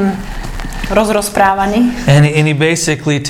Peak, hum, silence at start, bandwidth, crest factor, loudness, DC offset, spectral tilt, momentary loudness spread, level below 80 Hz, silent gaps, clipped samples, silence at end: 0 dBFS; none; 0 s; 15.5 kHz; 12 dB; -12 LUFS; under 0.1%; -5.5 dB/octave; 14 LU; -28 dBFS; none; 0.2%; 0 s